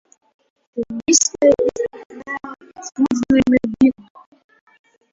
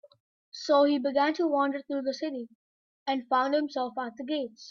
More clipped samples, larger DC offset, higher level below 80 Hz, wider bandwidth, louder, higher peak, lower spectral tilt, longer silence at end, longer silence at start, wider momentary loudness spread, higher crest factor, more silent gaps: neither; neither; first, -50 dBFS vs -80 dBFS; about the same, 7.8 kHz vs 7.4 kHz; first, -17 LUFS vs -28 LUFS; first, 0 dBFS vs -12 dBFS; about the same, -3 dB/octave vs -3.5 dB/octave; first, 1.2 s vs 0 s; first, 0.75 s vs 0.55 s; first, 19 LU vs 15 LU; about the same, 18 dB vs 18 dB; second, 2.06-2.10 s vs 2.55-3.06 s